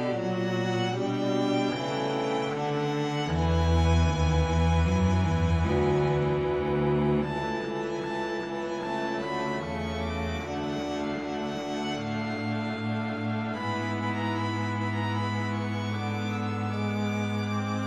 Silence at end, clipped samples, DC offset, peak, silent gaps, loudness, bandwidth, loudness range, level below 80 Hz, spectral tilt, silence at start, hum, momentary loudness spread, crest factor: 0 s; under 0.1%; under 0.1%; -12 dBFS; none; -28 LUFS; 9.6 kHz; 6 LU; -42 dBFS; -6.5 dB/octave; 0 s; none; 7 LU; 14 dB